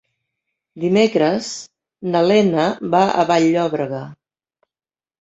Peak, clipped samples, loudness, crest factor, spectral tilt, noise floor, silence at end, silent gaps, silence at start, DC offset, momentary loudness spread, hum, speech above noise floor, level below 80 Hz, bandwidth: -2 dBFS; under 0.1%; -17 LUFS; 18 dB; -5.5 dB/octave; under -90 dBFS; 1.1 s; none; 0.75 s; under 0.1%; 15 LU; none; over 73 dB; -62 dBFS; 8 kHz